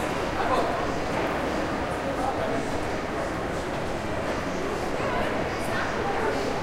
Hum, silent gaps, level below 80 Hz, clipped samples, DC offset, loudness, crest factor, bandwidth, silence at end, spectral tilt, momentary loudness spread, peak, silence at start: none; none; -42 dBFS; under 0.1%; under 0.1%; -28 LUFS; 16 dB; 16.5 kHz; 0 s; -5 dB/octave; 4 LU; -12 dBFS; 0 s